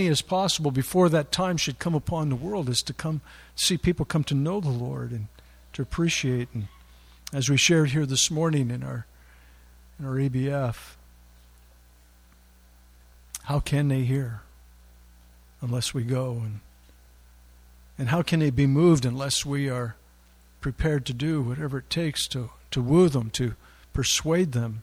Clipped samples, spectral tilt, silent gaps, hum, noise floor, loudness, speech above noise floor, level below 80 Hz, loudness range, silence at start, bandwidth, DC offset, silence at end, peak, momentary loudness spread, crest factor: under 0.1%; -5 dB/octave; none; 60 Hz at -50 dBFS; -55 dBFS; -25 LUFS; 30 dB; -46 dBFS; 8 LU; 0 s; 15.5 kHz; under 0.1%; 0 s; -8 dBFS; 15 LU; 20 dB